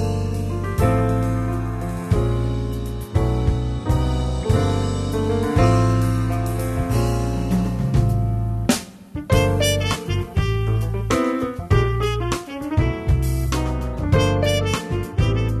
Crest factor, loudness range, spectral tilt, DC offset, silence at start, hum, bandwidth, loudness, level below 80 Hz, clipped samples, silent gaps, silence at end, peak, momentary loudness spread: 16 dB; 2 LU; -6 dB/octave; under 0.1%; 0 s; none; 13.5 kHz; -21 LUFS; -28 dBFS; under 0.1%; none; 0 s; -4 dBFS; 6 LU